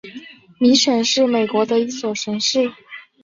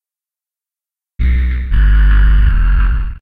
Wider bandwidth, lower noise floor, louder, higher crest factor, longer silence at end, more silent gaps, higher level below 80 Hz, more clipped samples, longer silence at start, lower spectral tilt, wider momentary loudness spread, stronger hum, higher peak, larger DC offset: first, 7.8 kHz vs 3.9 kHz; second, -39 dBFS vs -89 dBFS; second, -17 LUFS vs -14 LUFS; first, 16 dB vs 10 dB; first, 0.2 s vs 0.05 s; neither; second, -64 dBFS vs -12 dBFS; neither; second, 0.05 s vs 1.2 s; second, -3 dB/octave vs -8.5 dB/octave; first, 22 LU vs 6 LU; neither; second, -4 dBFS vs 0 dBFS; neither